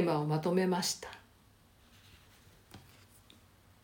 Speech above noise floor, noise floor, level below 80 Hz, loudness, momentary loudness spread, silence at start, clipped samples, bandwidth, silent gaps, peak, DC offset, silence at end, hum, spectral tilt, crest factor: 32 dB; -64 dBFS; -70 dBFS; -32 LUFS; 26 LU; 0 s; under 0.1%; 17 kHz; none; -16 dBFS; under 0.1%; 1.05 s; none; -5 dB/octave; 20 dB